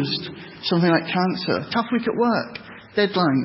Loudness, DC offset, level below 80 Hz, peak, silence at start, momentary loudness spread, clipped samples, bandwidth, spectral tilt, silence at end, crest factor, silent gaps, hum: -22 LUFS; under 0.1%; -60 dBFS; -6 dBFS; 0 s; 10 LU; under 0.1%; 5.8 kHz; -10 dB/octave; 0 s; 16 dB; none; none